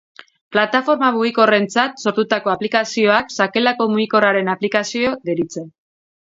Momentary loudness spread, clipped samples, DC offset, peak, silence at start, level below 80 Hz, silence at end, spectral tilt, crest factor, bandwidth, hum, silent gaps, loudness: 6 LU; under 0.1%; under 0.1%; 0 dBFS; 0.5 s; -62 dBFS; 0.6 s; -4.5 dB/octave; 18 dB; 7.8 kHz; none; none; -17 LUFS